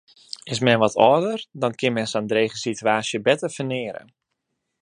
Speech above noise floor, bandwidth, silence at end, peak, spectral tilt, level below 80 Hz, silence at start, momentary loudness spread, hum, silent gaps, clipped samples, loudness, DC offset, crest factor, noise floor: 56 dB; 11.5 kHz; 0.85 s; 0 dBFS; -4.5 dB/octave; -64 dBFS; 0.45 s; 13 LU; none; none; under 0.1%; -21 LUFS; under 0.1%; 22 dB; -78 dBFS